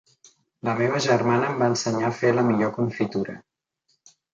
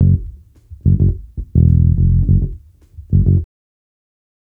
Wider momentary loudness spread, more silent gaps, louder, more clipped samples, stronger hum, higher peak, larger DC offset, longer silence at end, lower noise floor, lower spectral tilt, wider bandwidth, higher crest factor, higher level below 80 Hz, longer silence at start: second, 10 LU vs 14 LU; neither; second, -23 LUFS vs -15 LUFS; neither; neither; second, -6 dBFS vs 0 dBFS; neither; about the same, 0.95 s vs 1 s; first, -71 dBFS vs -39 dBFS; second, -5.5 dB/octave vs -14 dB/octave; first, 9 kHz vs 0.8 kHz; first, 20 dB vs 14 dB; second, -64 dBFS vs -22 dBFS; first, 0.65 s vs 0 s